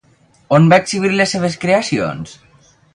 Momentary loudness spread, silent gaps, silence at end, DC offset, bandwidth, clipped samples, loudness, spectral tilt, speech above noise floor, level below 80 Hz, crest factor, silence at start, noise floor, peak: 13 LU; none; 0.6 s; under 0.1%; 11 kHz; under 0.1%; -14 LUFS; -5.5 dB/octave; 39 dB; -52 dBFS; 16 dB; 0.5 s; -53 dBFS; 0 dBFS